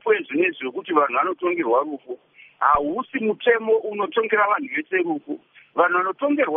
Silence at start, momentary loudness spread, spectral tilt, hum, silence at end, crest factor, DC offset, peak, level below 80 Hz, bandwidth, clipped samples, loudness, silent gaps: 0.05 s; 11 LU; -2.5 dB/octave; none; 0 s; 18 dB; under 0.1%; -4 dBFS; -58 dBFS; 3.8 kHz; under 0.1%; -22 LUFS; none